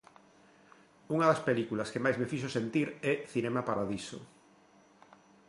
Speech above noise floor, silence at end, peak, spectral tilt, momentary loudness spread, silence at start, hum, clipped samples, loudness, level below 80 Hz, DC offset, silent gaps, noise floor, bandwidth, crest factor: 30 dB; 1.25 s; -14 dBFS; -6 dB/octave; 9 LU; 1.1 s; none; under 0.1%; -32 LUFS; -70 dBFS; under 0.1%; none; -62 dBFS; 11.5 kHz; 20 dB